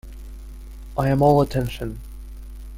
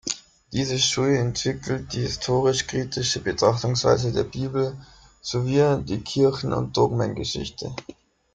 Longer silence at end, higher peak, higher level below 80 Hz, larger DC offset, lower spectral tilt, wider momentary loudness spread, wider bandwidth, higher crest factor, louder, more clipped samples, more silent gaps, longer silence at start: second, 0 s vs 0.4 s; about the same, -4 dBFS vs -4 dBFS; first, -36 dBFS vs -48 dBFS; neither; first, -8 dB/octave vs -4.5 dB/octave; first, 24 LU vs 10 LU; first, 16 kHz vs 9.4 kHz; about the same, 18 dB vs 20 dB; first, -21 LUFS vs -24 LUFS; neither; neither; about the same, 0.05 s vs 0.05 s